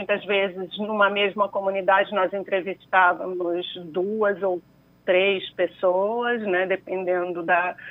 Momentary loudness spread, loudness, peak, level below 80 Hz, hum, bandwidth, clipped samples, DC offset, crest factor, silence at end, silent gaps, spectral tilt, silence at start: 8 LU; -23 LUFS; -4 dBFS; -70 dBFS; none; 4 kHz; under 0.1%; under 0.1%; 18 dB; 0 s; none; -7 dB/octave; 0 s